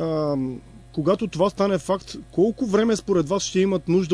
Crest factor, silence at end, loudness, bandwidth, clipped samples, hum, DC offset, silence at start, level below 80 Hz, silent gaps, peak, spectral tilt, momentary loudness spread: 16 dB; 0 s; -23 LUFS; 11 kHz; under 0.1%; none; under 0.1%; 0 s; -50 dBFS; none; -6 dBFS; -6 dB/octave; 8 LU